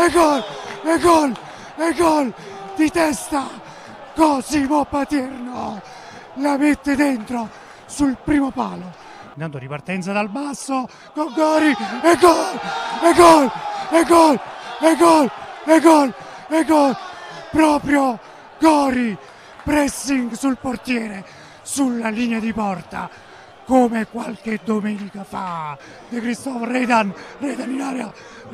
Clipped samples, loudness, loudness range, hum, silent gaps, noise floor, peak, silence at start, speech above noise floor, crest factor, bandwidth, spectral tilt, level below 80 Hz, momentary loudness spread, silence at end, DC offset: under 0.1%; -18 LUFS; 9 LU; none; none; -38 dBFS; -2 dBFS; 0 s; 20 dB; 18 dB; 14.5 kHz; -4.5 dB/octave; -48 dBFS; 18 LU; 0 s; under 0.1%